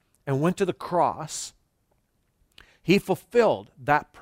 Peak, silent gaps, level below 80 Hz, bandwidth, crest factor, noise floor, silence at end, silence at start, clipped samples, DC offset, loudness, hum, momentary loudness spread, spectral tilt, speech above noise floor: -6 dBFS; none; -60 dBFS; 16 kHz; 20 dB; -70 dBFS; 0.2 s; 0.25 s; under 0.1%; under 0.1%; -25 LUFS; none; 12 LU; -5.5 dB/octave; 46 dB